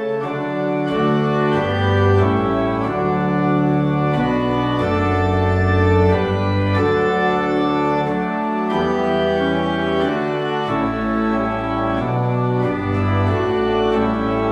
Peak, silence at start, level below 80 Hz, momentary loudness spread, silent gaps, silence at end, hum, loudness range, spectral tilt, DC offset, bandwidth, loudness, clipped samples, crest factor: -2 dBFS; 0 s; -40 dBFS; 4 LU; none; 0 s; none; 2 LU; -8 dB/octave; under 0.1%; 7.8 kHz; -18 LUFS; under 0.1%; 14 dB